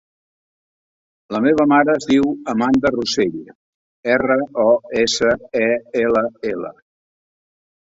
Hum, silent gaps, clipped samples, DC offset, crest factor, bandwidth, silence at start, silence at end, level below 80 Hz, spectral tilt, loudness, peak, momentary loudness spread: none; 3.55-4.03 s; under 0.1%; under 0.1%; 18 dB; 8 kHz; 1.3 s; 1.1 s; -52 dBFS; -4.5 dB/octave; -17 LUFS; -2 dBFS; 11 LU